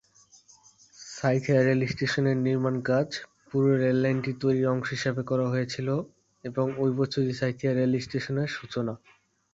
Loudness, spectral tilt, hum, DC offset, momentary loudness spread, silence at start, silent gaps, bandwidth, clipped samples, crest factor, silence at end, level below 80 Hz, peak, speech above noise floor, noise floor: -27 LUFS; -7 dB/octave; none; under 0.1%; 10 LU; 1 s; none; 7.8 kHz; under 0.1%; 16 dB; 0.6 s; -62 dBFS; -10 dBFS; 32 dB; -58 dBFS